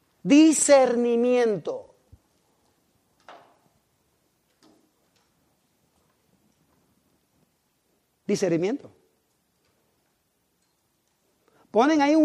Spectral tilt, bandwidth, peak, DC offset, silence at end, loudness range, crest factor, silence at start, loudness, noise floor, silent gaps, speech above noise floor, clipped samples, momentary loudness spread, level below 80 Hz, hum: -4 dB/octave; 12.5 kHz; -6 dBFS; under 0.1%; 0 s; 16 LU; 20 dB; 0.25 s; -21 LUFS; -72 dBFS; none; 52 dB; under 0.1%; 18 LU; -72 dBFS; none